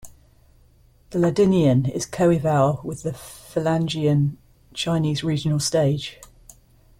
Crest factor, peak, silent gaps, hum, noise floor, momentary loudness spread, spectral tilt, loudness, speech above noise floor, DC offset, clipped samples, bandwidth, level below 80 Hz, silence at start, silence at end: 16 dB; -6 dBFS; none; none; -55 dBFS; 12 LU; -6 dB/octave; -22 LUFS; 34 dB; under 0.1%; under 0.1%; 16 kHz; -52 dBFS; 0.05 s; 0.85 s